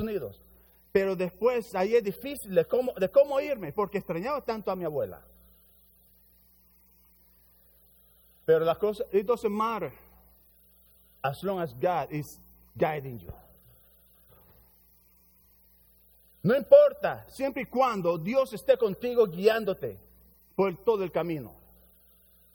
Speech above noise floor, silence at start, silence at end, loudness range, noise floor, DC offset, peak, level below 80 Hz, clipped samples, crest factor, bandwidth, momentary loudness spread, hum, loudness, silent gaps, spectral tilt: 35 dB; 0 s; 1.05 s; 12 LU; -62 dBFS; under 0.1%; -6 dBFS; -62 dBFS; under 0.1%; 24 dB; over 20 kHz; 13 LU; none; -28 LUFS; none; -6.5 dB/octave